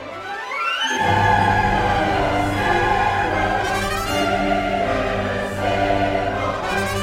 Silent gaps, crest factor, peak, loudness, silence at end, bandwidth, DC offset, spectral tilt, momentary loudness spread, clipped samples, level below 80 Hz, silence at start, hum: none; 14 dB; -4 dBFS; -20 LUFS; 0 s; 16.5 kHz; under 0.1%; -5 dB/octave; 6 LU; under 0.1%; -34 dBFS; 0 s; none